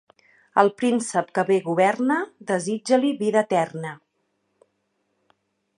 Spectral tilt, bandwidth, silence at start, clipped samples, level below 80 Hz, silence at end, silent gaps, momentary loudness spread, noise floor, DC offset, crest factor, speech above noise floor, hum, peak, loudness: -5 dB/octave; 11 kHz; 0.55 s; under 0.1%; -76 dBFS; 1.8 s; none; 7 LU; -73 dBFS; under 0.1%; 22 dB; 51 dB; none; -2 dBFS; -22 LUFS